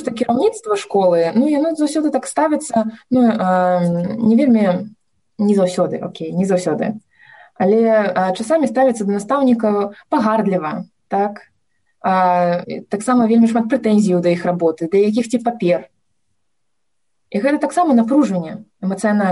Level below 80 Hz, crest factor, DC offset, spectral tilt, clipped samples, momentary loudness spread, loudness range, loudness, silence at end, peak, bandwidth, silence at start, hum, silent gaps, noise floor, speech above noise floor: -62 dBFS; 12 dB; under 0.1%; -6.5 dB/octave; under 0.1%; 9 LU; 3 LU; -17 LUFS; 0 s; -6 dBFS; 11.5 kHz; 0 s; none; none; -77 dBFS; 61 dB